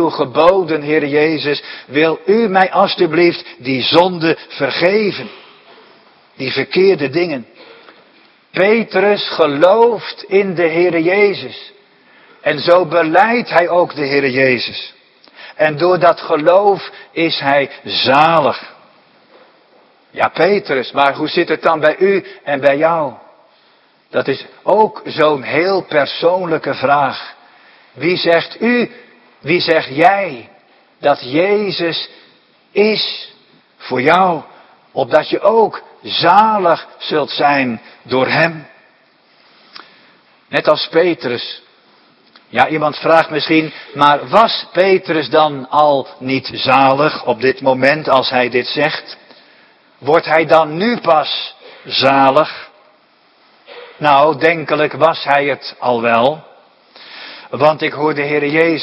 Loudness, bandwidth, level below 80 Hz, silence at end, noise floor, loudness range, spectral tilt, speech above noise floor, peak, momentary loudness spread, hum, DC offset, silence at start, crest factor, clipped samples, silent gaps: -14 LUFS; 8.6 kHz; -60 dBFS; 0 s; -52 dBFS; 4 LU; -6.5 dB/octave; 39 dB; 0 dBFS; 11 LU; none; under 0.1%; 0 s; 14 dB; 0.1%; none